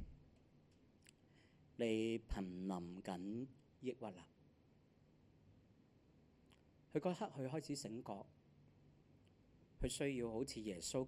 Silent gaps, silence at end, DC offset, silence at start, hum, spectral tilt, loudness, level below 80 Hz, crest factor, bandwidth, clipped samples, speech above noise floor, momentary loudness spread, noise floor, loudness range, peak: none; 0 s; under 0.1%; 0 s; none; -5 dB/octave; -46 LUFS; -62 dBFS; 22 dB; 13 kHz; under 0.1%; 27 dB; 12 LU; -72 dBFS; 8 LU; -26 dBFS